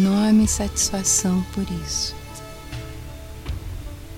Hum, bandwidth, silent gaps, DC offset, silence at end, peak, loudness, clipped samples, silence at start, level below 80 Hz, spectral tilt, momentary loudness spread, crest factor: none; 17 kHz; none; under 0.1%; 0 s; -6 dBFS; -20 LUFS; under 0.1%; 0 s; -36 dBFS; -4 dB/octave; 19 LU; 16 dB